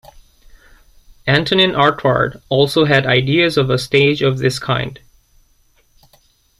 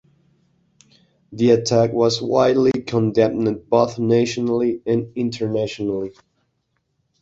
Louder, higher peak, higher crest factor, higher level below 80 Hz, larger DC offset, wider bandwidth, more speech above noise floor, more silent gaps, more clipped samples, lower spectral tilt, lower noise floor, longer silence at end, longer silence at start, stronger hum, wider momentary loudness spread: first, -15 LUFS vs -19 LUFS; about the same, 0 dBFS vs -2 dBFS; about the same, 16 dB vs 18 dB; first, -46 dBFS vs -56 dBFS; neither; first, 13.5 kHz vs 8 kHz; second, 41 dB vs 52 dB; neither; neither; about the same, -5.5 dB/octave vs -6 dB/octave; second, -56 dBFS vs -71 dBFS; first, 1.65 s vs 1.1 s; about the same, 1.25 s vs 1.3 s; neither; about the same, 7 LU vs 9 LU